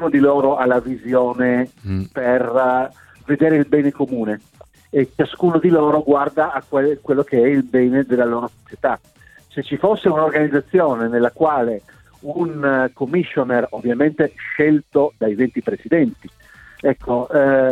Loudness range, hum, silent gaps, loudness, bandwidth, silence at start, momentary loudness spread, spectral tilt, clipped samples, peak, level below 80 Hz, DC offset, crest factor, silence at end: 2 LU; none; none; -18 LUFS; 9.2 kHz; 0 s; 9 LU; -8.5 dB/octave; under 0.1%; -2 dBFS; -52 dBFS; under 0.1%; 16 dB; 0 s